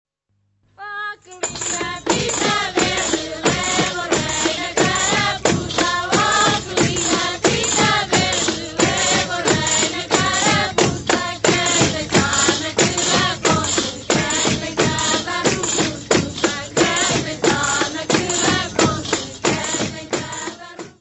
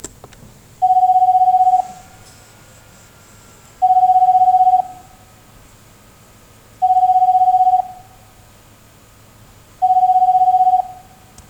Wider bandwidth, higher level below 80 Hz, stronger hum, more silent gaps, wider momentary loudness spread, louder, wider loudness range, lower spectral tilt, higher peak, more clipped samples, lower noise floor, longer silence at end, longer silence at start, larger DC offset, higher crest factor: second, 8.4 kHz vs 9.6 kHz; first, -44 dBFS vs -52 dBFS; neither; neither; about the same, 7 LU vs 9 LU; second, -18 LUFS vs -13 LUFS; about the same, 3 LU vs 1 LU; second, -2.5 dB/octave vs -4 dB/octave; first, 0 dBFS vs -4 dBFS; neither; first, -67 dBFS vs -46 dBFS; second, 0.1 s vs 0.55 s; first, 0.8 s vs 0.05 s; neither; first, 18 dB vs 12 dB